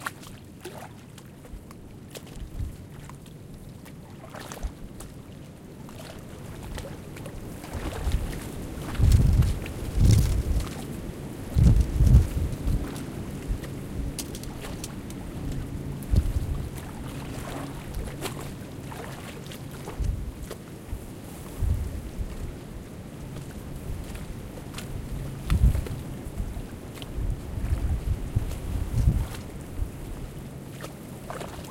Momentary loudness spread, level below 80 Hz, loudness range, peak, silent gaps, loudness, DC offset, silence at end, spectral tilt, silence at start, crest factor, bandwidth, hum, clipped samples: 20 LU; -32 dBFS; 16 LU; -4 dBFS; none; -30 LUFS; under 0.1%; 0 s; -6.5 dB/octave; 0 s; 24 dB; 16.5 kHz; none; under 0.1%